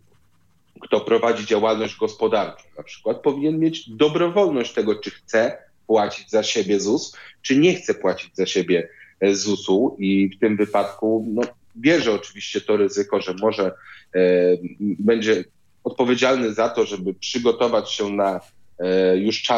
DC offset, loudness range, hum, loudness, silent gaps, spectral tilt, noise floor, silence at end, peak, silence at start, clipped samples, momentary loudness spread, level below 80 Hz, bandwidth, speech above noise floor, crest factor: under 0.1%; 1 LU; none; -21 LUFS; none; -4.5 dB/octave; -63 dBFS; 0 s; -2 dBFS; 0.8 s; under 0.1%; 9 LU; -66 dBFS; 7.8 kHz; 43 dB; 18 dB